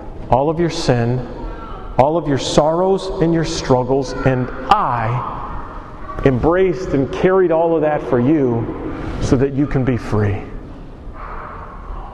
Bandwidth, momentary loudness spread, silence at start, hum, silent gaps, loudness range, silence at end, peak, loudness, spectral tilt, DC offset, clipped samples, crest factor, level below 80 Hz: 11 kHz; 17 LU; 0 s; none; none; 3 LU; 0 s; 0 dBFS; -17 LUFS; -6.5 dB/octave; under 0.1%; under 0.1%; 18 dB; -32 dBFS